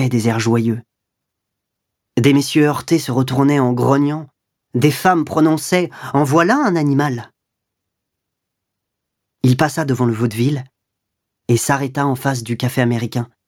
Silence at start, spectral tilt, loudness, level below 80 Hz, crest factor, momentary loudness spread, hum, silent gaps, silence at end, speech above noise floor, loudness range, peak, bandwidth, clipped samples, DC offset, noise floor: 0 s; -6 dB/octave; -17 LUFS; -58 dBFS; 18 dB; 7 LU; none; none; 0.25 s; 63 dB; 5 LU; 0 dBFS; 17.5 kHz; under 0.1%; under 0.1%; -78 dBFS